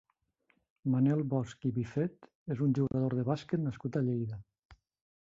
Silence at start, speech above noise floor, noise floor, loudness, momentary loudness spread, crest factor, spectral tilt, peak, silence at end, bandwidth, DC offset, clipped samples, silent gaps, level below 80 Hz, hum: 0.85 s; 43 dB; -75 dBFS; -33 LUFS; 11 LU; 16 dB; -9 dB/octave; -18 dBFS; 0.5 s; 7.6 kHz; under 0.1%; under 0.1%; 2.35-2.46 s, 4.65-4.69 s; -64 dBFS; none